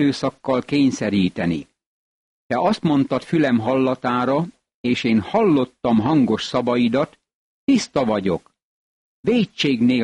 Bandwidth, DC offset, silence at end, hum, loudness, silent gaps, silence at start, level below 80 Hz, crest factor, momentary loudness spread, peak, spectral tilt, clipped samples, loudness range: 10.5 kHz; under 0.1%; 0 s; none; -20 LUFS; 1.86-2.50 s, 4.74-4.84 s, 7.34-7.67 s, 8.62-9.23 s; 0 s; -54 dBFS; 12 dB; 7 LU; -8 dBFS; -6 dB/octave; under 0.1%; 2 LU